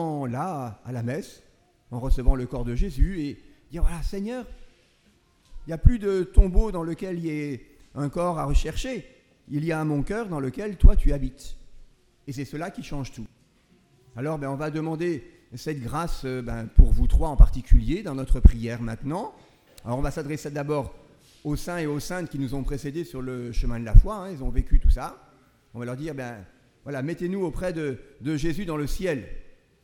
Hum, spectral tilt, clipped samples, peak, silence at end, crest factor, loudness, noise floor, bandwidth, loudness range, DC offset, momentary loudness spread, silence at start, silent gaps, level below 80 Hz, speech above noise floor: none; -7.5 dB/octave; under 0.1%; 0 dBFS; 0.4 s; 22 dB; -28 LUFS; -62 dBFS; 12 kHz; 8 LU; under 0.1%; 16 LU; 0 s; none; -24 dBFS; 39 dB